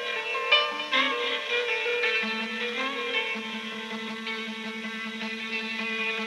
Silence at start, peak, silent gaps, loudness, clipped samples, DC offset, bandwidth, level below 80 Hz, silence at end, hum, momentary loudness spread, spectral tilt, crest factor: 0 s; -8 dBFS; none; -27 LUFS; under 0.1%; under 0.1%; 13 kHz; -80 dBFS; 0 s; none; 11 LU; -2.5 dB/octave; 22 dB